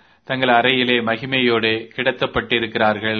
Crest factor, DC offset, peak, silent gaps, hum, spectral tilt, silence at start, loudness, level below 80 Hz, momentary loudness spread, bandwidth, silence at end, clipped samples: 18 dB; under 0.1%; 0 dBFS; none; none; -7 dB/octave; 0.3 s; -18 LUFS; -50 dBFS; 6 LU; 6.4 kHz; 0 s; under 0.1%